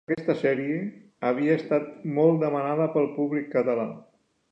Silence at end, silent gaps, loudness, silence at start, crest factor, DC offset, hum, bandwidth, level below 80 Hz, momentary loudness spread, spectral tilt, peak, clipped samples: 0.5 s; none; -26 LUFS; 0.1 s; 18 dB; under 0.1%; none; 7.8 kHz; -76 dBFS; 9 LU; -9 dB/octave; -8 dBFS; under 0.1%